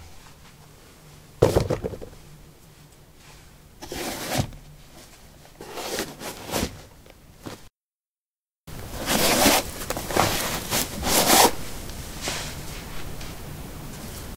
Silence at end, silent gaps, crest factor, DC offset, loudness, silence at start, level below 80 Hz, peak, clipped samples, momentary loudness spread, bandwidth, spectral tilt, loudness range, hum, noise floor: 0 s; 7.76-8.00 s, 8.07-8.51 s, 8.58-8.64 s; 26 dB; under 0.1%; -23 LUFS; 0 s; -42 dBFS; -2 dBFS; under 0.1%; 23 LU; 16 kHz; -3 dB/octave; 14 LU; none; under -90 dBFS